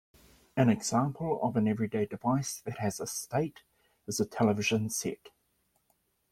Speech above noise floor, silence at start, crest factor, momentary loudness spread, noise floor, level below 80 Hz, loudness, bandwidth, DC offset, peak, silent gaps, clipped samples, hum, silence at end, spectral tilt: 44 dB; 0.55 s; 20 dB; 10 LU; -75 dBFS; -66 dBFS; -31 LUFS; 16 kHz; under 0.1%; -12 dBFS; none; under 0.1%; none; 1.05 s; -5 dB/octave